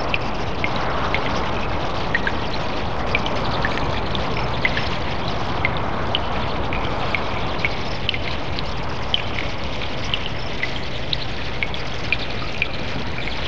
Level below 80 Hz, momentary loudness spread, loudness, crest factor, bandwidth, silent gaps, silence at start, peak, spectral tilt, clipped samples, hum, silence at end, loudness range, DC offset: -34 dBFS; 4 LU; -24 LUFS; 22 dB; 8 kHz; none; 0 s; -2 dBFS; -5 dB/octave; under 0.1%; none; 0 s; 2 LU; 6%